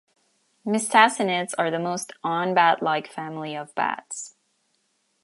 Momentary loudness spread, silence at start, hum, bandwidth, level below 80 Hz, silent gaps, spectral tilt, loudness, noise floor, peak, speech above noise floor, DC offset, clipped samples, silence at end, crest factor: 16 LU; 0.65 s; none; 11.5 kHz; -80 dBFS; none; -3.5 dB/octave; -23 LUFS; -70 dBFS; -2 dBFS; 47 dB; under 0.1%; under 0.1%; 0.95 s; 24 dB